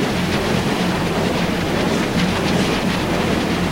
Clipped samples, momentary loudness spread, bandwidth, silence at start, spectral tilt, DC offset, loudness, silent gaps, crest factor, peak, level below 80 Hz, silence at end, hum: under 0.1%; 1 LU; 16 kHz; 0 s; -5 dB/octave; under 0.1%; -19 LUFS; none; 14 dB; -6 dBFS; -36 dBFS; 0 s; none